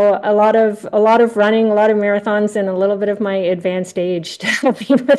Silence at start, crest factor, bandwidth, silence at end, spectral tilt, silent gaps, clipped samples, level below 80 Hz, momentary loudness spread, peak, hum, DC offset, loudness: 0 s; 12 dB; 12.5 kHz; 0 s; -5.5 dB/octave; none; under 0.1%; -66 dBFS; 8 LU; -2 dBFS; none; under 0.1%; -15 LUFS